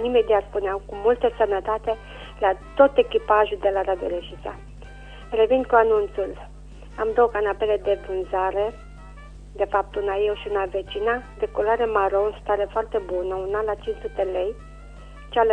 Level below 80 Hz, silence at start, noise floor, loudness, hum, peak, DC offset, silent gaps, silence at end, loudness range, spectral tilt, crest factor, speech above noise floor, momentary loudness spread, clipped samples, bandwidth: -42 dBFS; 0 s; -41 dBFS; -23 LUFS; none; -4 dBFS; under 0.1%; none; 0 s; 4 LU; -6.5 dB/octave; 20 dB; 19 dB; 19 LU; under 0.1%; 9.4 kHz